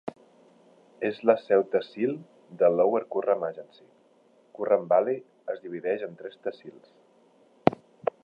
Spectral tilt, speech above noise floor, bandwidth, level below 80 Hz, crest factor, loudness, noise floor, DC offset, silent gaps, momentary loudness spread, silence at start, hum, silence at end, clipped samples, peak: -8.5 dB/octave; 35 dB; 5.4 kHz; -68 dBFS; 28 dB; -27 LUFS; -61 dBFS; under 0.1%; none; 14 LU; 0.05 s; none; 0.5 s; under 0.1%; 0 dBFS